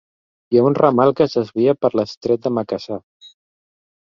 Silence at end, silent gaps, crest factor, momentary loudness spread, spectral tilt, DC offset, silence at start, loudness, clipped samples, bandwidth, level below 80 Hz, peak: 1.05 s; 2.17-2.21 s; 18 dB; 11 LU; -8 dB/octave; under 0.1%; 0.5 s; -18 LUFS; under 0.1%; 7.2 kHz; -58 dBFS; 0 dBFS